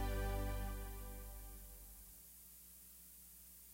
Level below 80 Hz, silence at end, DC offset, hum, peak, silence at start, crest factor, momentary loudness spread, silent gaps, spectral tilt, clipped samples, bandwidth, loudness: -48 dBFS; 0 s; under 0.1%; none; -30 dBFS; 0 s; 16 dB; 14 LU; none; -5 dB/octave; under 0.1%; 16 kHz; -50 LUFS